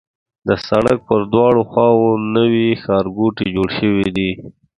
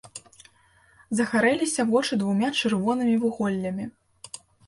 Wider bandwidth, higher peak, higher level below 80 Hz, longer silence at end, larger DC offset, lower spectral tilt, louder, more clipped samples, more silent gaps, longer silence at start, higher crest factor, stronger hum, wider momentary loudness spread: about the same, 11 kHz vs 11.5 kHz; first, 0 dBFS vs -10 dBFS; first, -44 dBFS vs -64 dBFS; about the same, 0.25 s vs 0.3 s; neither; first, -7.5 dB/octave vs -4.5 dB/octave; first, -16 LUFS vs -24 LUFS; neither; neither; first, 0.45 s vs 0.05 s; about the same, 16 dB vs 16 dB; neither; second, 7 LU vs 20 LU